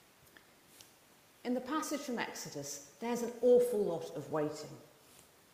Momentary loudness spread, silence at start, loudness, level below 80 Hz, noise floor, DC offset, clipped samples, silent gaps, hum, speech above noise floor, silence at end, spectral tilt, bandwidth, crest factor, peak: 16 LU; 0.8 s; -35 LUFS; -78 dBFS; -64 dBFS; under 0.1%; under 0.1%; none; none; 29 dB; 0.7 s; -4.5 dB/octave; 15.5 kHz; 20 dB; -18 dBFS